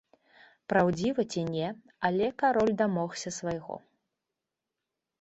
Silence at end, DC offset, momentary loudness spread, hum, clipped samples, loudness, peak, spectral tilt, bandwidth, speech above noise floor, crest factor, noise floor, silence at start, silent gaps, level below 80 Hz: 1.45 s; under 0.1%; 12 LU; none; under 0.1%; -29 LUFS; -10 dBFS; -5.5 dB/octave; 8.2 kHz; 59 dB; 20 dB; -88 dBFS; 0.7 s; none; -64 dBFS